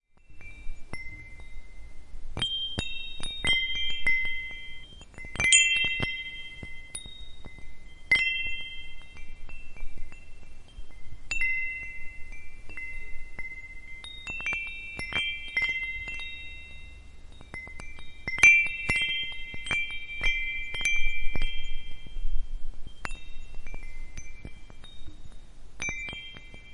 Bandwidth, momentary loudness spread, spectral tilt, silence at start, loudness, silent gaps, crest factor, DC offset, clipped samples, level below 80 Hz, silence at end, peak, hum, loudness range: 11 kHz; 24 LU; -0.5 dB/octave; 0.3 s; -27 LUFS; none; 26 dB; under 0.1%; under 0.1%; -38 dBFS; 0 s; -2 dBFS; none; 16 LU